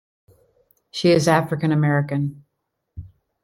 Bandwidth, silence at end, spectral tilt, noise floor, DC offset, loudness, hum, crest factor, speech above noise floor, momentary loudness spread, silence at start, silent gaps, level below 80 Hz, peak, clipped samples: 14 kHz; 0.35 s; -6 dB/octave; -77 dBFS; under 0.1%; -20 LUFS; none; 20 dB; 58 dB; 25 LU; 0.95 s; none; -54 dBFS; -2 dBFS; under 0.1%